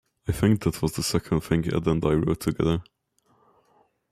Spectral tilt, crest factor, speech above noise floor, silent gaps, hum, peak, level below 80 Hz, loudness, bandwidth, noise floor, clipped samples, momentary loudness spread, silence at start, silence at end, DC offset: -6 dB/octave; 18 dB; 42 dB; none; none; -8 dBFS; -44 dBFS; -25 LUFS; 15 kHz; -66 dBFS; under 0.1%; 4 LU; 0.25 s; 1.3 s; under 0.1%